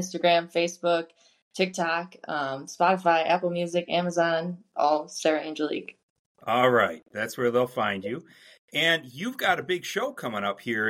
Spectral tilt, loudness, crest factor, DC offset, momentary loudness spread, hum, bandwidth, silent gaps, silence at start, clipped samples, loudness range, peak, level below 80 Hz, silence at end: -4 dB/octave; -26 LUFS; 18 dB; under 0.1%; 10 LU; none; 16 kHz; 1.42-1.51 s, 6.03-6.35 s, 8.59-8.68 s; 0 s; under 0.1%; 2 LU; -8 dBFS; -76 dBFS; 0 s